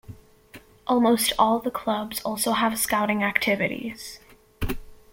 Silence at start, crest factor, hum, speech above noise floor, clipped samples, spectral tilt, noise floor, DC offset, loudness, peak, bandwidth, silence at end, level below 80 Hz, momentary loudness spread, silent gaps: 0.1 s; 22 dB; none; 26 dB; under 0.1%; -3.5 dB/octave; -50 dBFS; under 0.1%; -24 LUFS; -2 dBFS; 17 kHz; 0.2 s; -44 dBFS; 14 LU; none